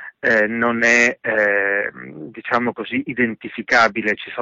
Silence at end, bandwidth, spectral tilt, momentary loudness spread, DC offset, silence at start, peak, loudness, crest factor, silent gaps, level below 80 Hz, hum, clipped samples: 0 s; 7.8 kHz; -4 dB/octave; 13 LU; under 0.1%; 0 s; -4 dBFS; -18 LUFS; 14 dB; none; -58 dBFS; none; under 0.1%